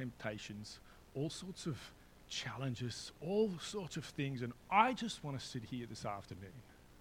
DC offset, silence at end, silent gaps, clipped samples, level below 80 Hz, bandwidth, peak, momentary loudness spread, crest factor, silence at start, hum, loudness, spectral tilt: under 0.1%; 0 s; none; under 0.1%; -66 dBFS; 16.5 kHz; -16 dBFS; 17 LU; 24 dB; 0 s; none; -41 LUFS; -5 dB/octave